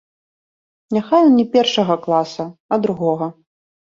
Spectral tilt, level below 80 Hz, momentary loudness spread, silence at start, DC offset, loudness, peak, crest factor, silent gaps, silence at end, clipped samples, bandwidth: -6 dB/octave; -62 dBFS; 12 LU; 0.9 s; under 0.1%; -17 LUFS; -2 dBFS; 16 dB; 2.60-2.69 s; 0.65 s; under 0.1%; 7.4 kHz